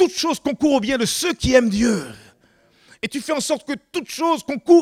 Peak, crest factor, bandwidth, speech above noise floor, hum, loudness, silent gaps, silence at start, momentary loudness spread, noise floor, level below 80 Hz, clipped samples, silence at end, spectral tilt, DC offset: -2 dBFS; 18 dB; 16 kHz; 38 dB; none; -20 LUFS; none; 0 s; 11 LU; -57 dBFS; -44 dBFS; under 0.1%; 0 s; -4 dB/octave; under 0.1%